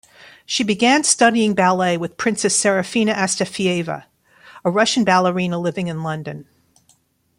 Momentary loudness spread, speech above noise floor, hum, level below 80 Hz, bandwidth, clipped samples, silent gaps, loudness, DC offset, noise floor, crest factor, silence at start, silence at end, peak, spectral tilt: 12 LU; 42 dB; none; -62 dBFS; 15.5 kHz; under 0.1%; none; -18 LUFS; under 0.1%; -60 dBFS; 20 dB; 0.2 s; 0.95 s; 0 dBFS; -3.5 dB/octave